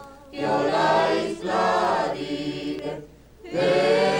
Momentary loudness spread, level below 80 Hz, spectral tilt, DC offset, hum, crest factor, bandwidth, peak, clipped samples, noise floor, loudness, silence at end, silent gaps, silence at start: 12 LU; -56 dBFS; -5 dB/octave; under 0.1%; none; 14 dB; 16.5 kHz; -8 dBFS; under 0.1%; -44 dBFS; -23 LUFS; 0 s; none; 0 s